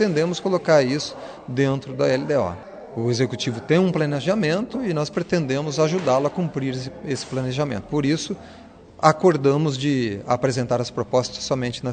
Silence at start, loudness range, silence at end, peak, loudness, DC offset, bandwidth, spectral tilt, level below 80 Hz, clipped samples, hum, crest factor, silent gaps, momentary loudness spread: 0 s; 2 LU; 0 s; 0 dBFS; -22 LUFS; under 0.1%; 9.4 kHz; -6 dB/octave; -56 dBFS; under 0.1%; none; 22 dB; none; 10 LU